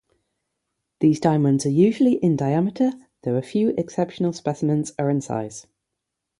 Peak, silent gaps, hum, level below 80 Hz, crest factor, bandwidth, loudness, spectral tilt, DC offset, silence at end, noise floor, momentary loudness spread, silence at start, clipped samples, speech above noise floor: -4 dBFS; none; none; -62 dBFS; 18 dB; 11.5 kHz; -22 LUFS; -7.5 dB/octave; under 0.1%; 0.8 s; -82 dBFS; 9 LU; 1 s; under 0.1%; 61 dB